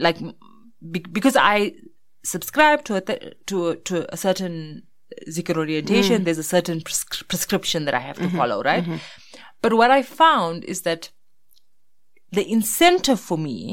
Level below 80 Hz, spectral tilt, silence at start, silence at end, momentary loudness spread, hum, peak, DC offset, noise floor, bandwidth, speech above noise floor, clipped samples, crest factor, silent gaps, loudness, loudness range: -56 dBFS; -4 dB/octave; 0 s; 0 s; 15 LU; none; -2 dBFS; under 0.1%; -77 dBFS; 16.5 kHz; 56 dB; under 0.1%; 20 dB; none; -21 LUFS; 3 LU